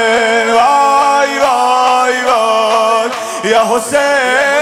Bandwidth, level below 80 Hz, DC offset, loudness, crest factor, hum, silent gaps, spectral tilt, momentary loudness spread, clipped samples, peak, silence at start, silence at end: 16.5 kHz; -54 dBFS; under 0.1%; -11 LUFS; 10 dB; none; none; -1.5 dB/octave; 3 LU; under 0.1%; 0 dBFS; 0 s; 0 s